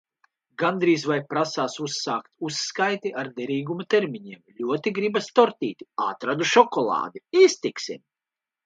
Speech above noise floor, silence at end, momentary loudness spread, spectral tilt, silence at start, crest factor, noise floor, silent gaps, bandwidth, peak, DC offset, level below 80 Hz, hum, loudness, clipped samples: 66 dB; 0.7 s; 13 LU; -4 dB/octave; 0.6 s; 24 dB; -90 dBFS; none; 9.2 kHz; -2 dBFS; under 0.1%; -76 dBFS; none; -24 LUFS; under 0.1%